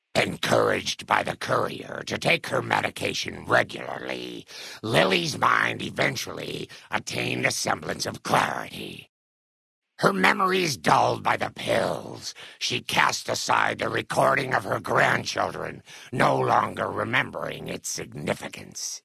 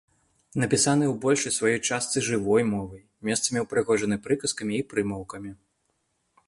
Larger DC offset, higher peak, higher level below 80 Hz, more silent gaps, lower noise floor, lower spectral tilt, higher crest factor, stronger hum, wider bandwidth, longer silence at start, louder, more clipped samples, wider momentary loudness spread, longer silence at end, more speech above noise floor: neither; first, 0 dBFS vs -8 dBFS; about the same, -62 dBFS vs -58 dBFS; first, 9.09-9.82 s vs none; first, under -90 dBFS vs -74 dBFS; about the same, -3.5 dB/octave vs -4 dB/octave; first, 24 dB vs 18 dB; neither; about the same, 12 kHz vs 11.5 kHz; second, 0.15 s vs 0.55 s; about the same, -25 LUFS vs -25 LUFS; neither; about the same, 13 LU vs 13 LU; second, 0.05 s vs 0.95 s; first, over 64 dB vs 48 dB